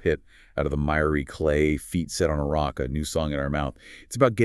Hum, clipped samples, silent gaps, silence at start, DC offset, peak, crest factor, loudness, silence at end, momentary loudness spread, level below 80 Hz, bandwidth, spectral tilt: none; under 0.1%; none; 0 s; under 0.1%; -6 dBFS; 20 dB; -26 LUFS; 0 s; 9 LU; -38 dBFS; 13.5 kHz; -6 dB/octave